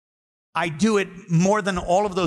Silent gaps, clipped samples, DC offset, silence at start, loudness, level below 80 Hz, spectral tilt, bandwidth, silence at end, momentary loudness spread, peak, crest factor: none; under 0.1%; under 0.1%; 0.55 s; -22 LUFS; -48 dBFS; -5.5 dB/octave; 11.5 kHz; 0 s; 7 LU; -10 dBFS; 12 dB